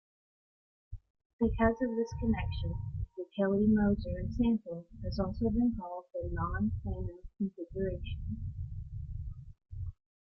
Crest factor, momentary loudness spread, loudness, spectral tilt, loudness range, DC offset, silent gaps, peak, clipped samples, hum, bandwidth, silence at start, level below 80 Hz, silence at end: 18 dB; 15 LU; -34 LUFS; -9 dB/octave; 7 LU; under 0.1%; 1.10-1.14 s, 1.25-1.39 s; -16 dBFS; under 0.1%; none; 6.4 kHz; 0.9 s; -44 dBFS; 0.3 s